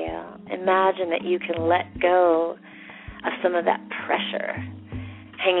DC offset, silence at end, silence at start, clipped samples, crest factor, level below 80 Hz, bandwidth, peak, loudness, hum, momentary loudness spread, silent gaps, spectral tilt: under 0.1%; 0 s; 0 s; under 0.1%; 18 dB; -52 dBFS; 4.1 kHz; -6 dBFS; -24 LUFS; none; 17 LU; none; -3 dB/octave